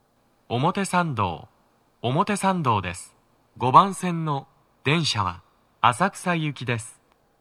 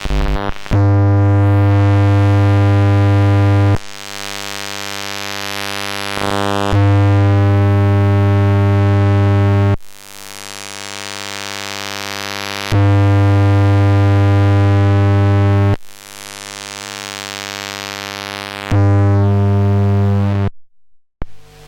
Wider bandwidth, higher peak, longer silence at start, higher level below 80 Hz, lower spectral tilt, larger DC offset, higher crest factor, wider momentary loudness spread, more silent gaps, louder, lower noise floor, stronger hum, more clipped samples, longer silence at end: about the same, 13.5 kHz vs 14 kHz; about the same, -2 dBFS vs 0 dBFS; first, 0.5 s vs 0 s; second, -60 dBFS vs -32 dBFS; second, -5 dB/octave vs -6.5 dB/octave; neither; first, 24 dB vs 14 dB; about the same, 14 LU vs 13 LU; neither; second, -23 LUFS vs -14 LUFS; first, -64 dBFS vs -48 dBFS; neither; neither; first, 0.5 s vs 0 s